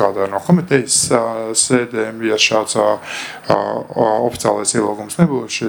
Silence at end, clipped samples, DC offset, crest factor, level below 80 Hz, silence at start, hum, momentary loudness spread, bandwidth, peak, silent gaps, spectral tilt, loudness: 0 s; under 0.1%; under 0.1%; 16 dB; -54 dBFS; 0 s; none; 7 LU; 19.5 kHz; 0 dBFS; none; -4 dB/octave; -16 LUFS